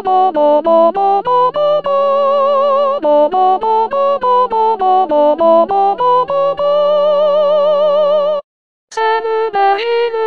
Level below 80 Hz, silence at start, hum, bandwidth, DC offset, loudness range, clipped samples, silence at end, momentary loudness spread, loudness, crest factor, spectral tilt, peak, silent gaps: -58 dBFS; 0 s; none; 7 kHz; 1%; 2 LU; under 0.1%; 0 s; 4 LU; -12 LUFS; 12 dB; -5 dB/octave; 0 dBFS; 8.44-8.88 s